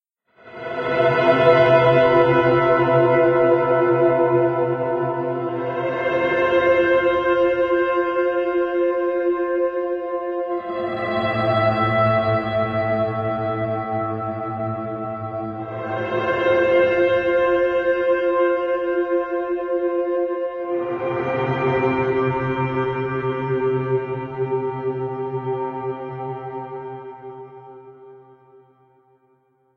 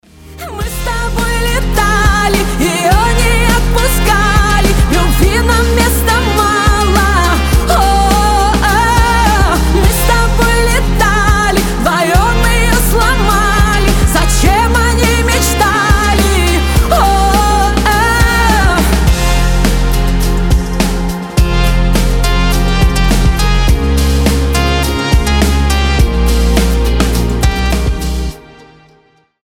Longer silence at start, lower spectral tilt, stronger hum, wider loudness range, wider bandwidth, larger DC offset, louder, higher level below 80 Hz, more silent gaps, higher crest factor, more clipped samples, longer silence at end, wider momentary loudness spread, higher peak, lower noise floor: first, 0.45 s vs 0.25 s; first, -8.5 dB/octave vs -4.5 dB/octave; neither; first, 11 LU vs 3 LU; second, 6 kHz vs 18 kHz; neither; second, -20 LUFS vs -11 LUFS; second, -54 dBFS vs -12 dBFS; neither; first, 18 dB vs 10 dB; neither; first, 1.6 s vs 1.05 s; first, 12 LU vs 4 LU; about the same, -2 dBFS vs 0 dBFS; first, -62 dBFS vs -50 dBFS